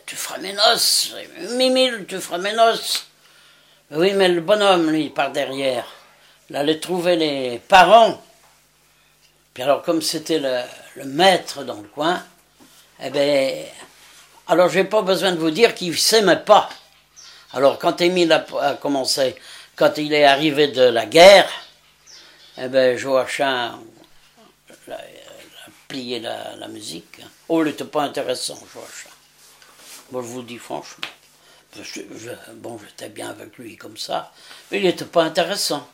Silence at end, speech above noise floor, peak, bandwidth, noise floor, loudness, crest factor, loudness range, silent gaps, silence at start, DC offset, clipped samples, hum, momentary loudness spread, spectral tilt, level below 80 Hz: 0.1 s; 38 dB; 0 dBFS; 16 kHz; -57 dBFS; -18 LUFS; 20 dB; 18 LU; none; 0.05 s; under 0.1%; under 0.1%; none; 21 LU; -3 dB/octave; -62 dBFS